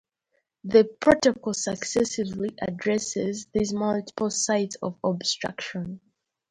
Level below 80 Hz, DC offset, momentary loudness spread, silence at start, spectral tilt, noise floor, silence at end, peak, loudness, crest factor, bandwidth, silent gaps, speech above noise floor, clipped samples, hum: -56 dBFS; under 0.1%; 11 LU; 0.65 s; -4 dB/octave; -75 dBFS; 0.55 s; -4 dBFS; -25 LUFS; 22 dB; 11 kHz; none; 50 dB; under 0.1%; none